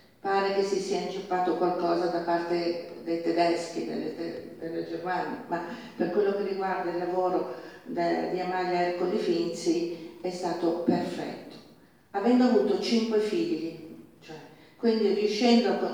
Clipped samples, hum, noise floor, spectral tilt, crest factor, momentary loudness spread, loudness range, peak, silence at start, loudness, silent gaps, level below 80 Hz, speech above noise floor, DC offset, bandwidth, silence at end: under 0.1%; none; -56 dBFS; -5.5 dB/octave; 18 dB; 13 LU; 4 LU; -10 dBFS; 0.25 s; -28 LUFS; none; -72 dBFS; 29 dB; under 0.1%; 19 kHz; 0 s